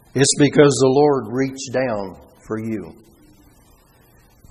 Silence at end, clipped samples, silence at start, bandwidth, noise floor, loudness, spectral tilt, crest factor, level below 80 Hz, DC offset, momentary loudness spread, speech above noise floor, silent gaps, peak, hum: 1.6 s; under 0.1%; 0.15 s; 13 kHz; -52 dBFS; -17 LUFS; -4.5 dB/octave; 20 dB; -52 dBFS; under 0.1%; 17 LU; 35 dB; none; 0 dBFS; none